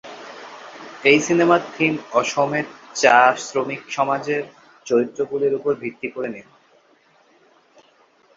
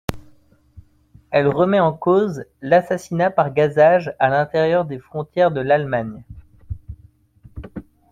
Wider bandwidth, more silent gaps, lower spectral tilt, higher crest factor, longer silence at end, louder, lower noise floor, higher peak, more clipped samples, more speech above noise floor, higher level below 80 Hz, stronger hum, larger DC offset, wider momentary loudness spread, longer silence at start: second, 7.8 kHz vs 16 kHz; neither; second, -4 dB/octave vs -7 dB/octave; about the same, 20 dB vs 18 dB; first, 1.95 s vs 0.3 s; about the same, -19 LUFS vs -18 LUFS; first, -57 dBFS vs -53 dBFS; about the same, -2 dBFS vs -2 dBFS; neither; about the same, 37 dB vs 35 dB; second, -68 dBFS vs -46 dBFS; neither; neither; about the same, 22 LU vs 21 LU; about the same, 0.05 s vs 0.1 s